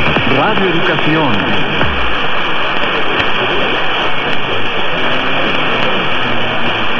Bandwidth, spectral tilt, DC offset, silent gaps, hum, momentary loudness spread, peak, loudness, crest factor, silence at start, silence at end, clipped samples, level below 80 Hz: 7.2 kHz; -5.5 dB/octave; under 0.1%; none; none; 3 LU; 0 dBFS; -14 LUFS; 12 dB; 0 s; 0 s; under 0.1%; -34 dBFS